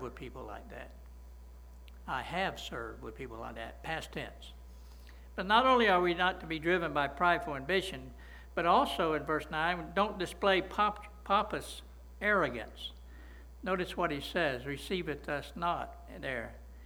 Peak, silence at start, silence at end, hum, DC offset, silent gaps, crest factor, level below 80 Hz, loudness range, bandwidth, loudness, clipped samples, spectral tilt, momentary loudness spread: -12 dBFS; 0 s; 0 s; none; under 0.1%; none; 22 dB; -52 dBFS; 11 LU; over 20 kHz; -32 LUFS; under 0.1%; -5 dB/octave; 22 LU